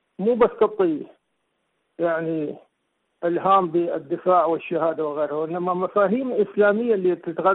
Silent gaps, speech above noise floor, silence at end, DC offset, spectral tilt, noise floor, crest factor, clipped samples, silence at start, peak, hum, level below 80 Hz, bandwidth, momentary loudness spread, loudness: none; 52 dB; 0 s; under 0.1%; -10.5 dB/octave; -73 dBFS; 14 dB; under 0.1%; 0.2 s; -8 dBFS; none; -64 dBFS; 4.1 kHz; 8 LU; -22 LUFS